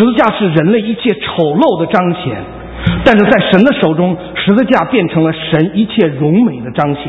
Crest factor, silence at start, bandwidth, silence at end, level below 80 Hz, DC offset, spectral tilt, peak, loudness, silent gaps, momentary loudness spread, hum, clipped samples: 10 dB; 0 s; 7.4 kHz; 0 s; -36 dBFS; under 0.1%; -8.5 dB/octave; 0 dBFS; -11 LUFS; none; 7 LU; none; 0.3%